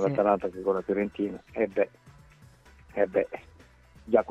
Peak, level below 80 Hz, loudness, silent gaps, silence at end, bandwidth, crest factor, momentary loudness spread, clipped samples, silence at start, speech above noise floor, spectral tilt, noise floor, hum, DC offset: -8 dBFS; -58 dBFS; -29 LUFS; none; 0 s; 8.2 kHz; 22 dB; 9 LU; under 0.1%; 0 s; 27 dB; -8 dB/octave; -55 dBFS; none; under 0.1%